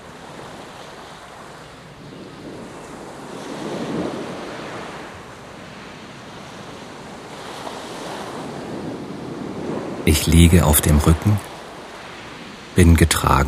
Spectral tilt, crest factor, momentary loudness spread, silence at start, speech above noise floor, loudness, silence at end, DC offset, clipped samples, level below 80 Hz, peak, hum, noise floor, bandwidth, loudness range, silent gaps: -5 dB/octave; 22 dB; 23 LU; 0 s; 26 dB; -19 LUFS; 0 s; under 0.1%; under 0.1%; -30 dBFS; 0 dBFS; none; -40 dBFS; 16 kHz; 17 LU; none